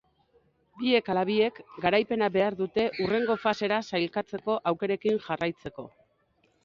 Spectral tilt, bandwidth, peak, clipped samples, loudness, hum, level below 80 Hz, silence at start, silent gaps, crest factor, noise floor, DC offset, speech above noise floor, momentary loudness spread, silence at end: -6 dB/octave; 7.4 kHz; -10 dBFS; under 0.1%; -28 LUFS; none; -64 dBFS; 0.75 s; none; 18 dB; -69 dBFS; under 0.1%; 42 dB; 7 LU; 0.75 s